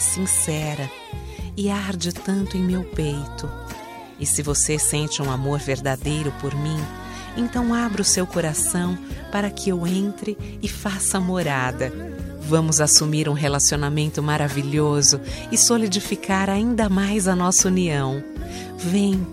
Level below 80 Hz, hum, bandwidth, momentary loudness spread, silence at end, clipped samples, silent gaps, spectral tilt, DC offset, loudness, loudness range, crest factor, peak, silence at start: -40 dBFS; none; 16 kHz; 15 LU; 0 s; under 0.1%; none; -3.5 dB/octave; under 0.1%; -21 LUFS; 6 LU; 22 dB; 0 dBFS; 0 s